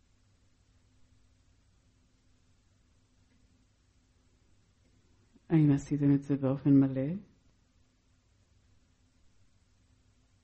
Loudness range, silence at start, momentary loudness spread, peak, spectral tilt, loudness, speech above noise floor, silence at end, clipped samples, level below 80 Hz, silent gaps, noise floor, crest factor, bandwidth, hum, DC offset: 8 LU; 5.5 s; 10 LU; -14 dBFS; -9.5 dB/octave; -28 LUFS; 42 dB; 3.25 s; under 0.1%; -64 dBFS; none; -69 dBFS; 20 dB; 8.2 kHz; none; under 0.1%